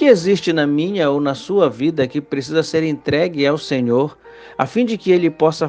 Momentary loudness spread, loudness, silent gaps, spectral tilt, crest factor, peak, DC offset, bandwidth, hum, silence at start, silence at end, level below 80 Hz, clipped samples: 6 LU; -17 LUFS; none; -6 dB/octave; 16 dB; 0 dBFS; under 0.1%; 9.4 kHz; none; 0 s; 0 s; -58 dBFS; under 0.1%